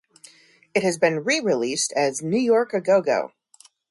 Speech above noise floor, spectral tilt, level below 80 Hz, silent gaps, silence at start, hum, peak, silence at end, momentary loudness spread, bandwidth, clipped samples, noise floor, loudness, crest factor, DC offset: 34 dB; -3.5 dB/octave; -70 dBFS; none; 0.75 s; none; -6 dBFS; 0.65 s; 5 LU; 11.5 kHz; under 0.1%; -55 dBFS; -22 LUFS; 16 dB; under 0.1%